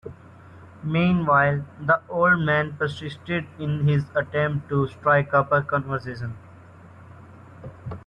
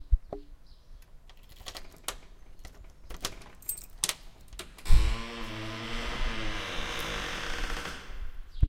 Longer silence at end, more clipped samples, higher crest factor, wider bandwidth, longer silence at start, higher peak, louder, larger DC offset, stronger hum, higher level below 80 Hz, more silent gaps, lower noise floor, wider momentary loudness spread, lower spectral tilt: about the same, 0.05 s vs 0 s; neither; second, 18 dB vs 24 dB; second, 6.8 kHz vs 16.5 kHz; about the same, 0.05 s vs 0 s; about the same, -6 dBFS vs -6 dBFS; first, -23 LUFS vs -35 LUFS; neither; neither; second, -54 dBFS vs -32 dBFS; neither; second, -46 dBFS vs -50 dBFS; second, 16 LU vs 19 LU; first, -8.5 dB/octave vs -3 dB/octave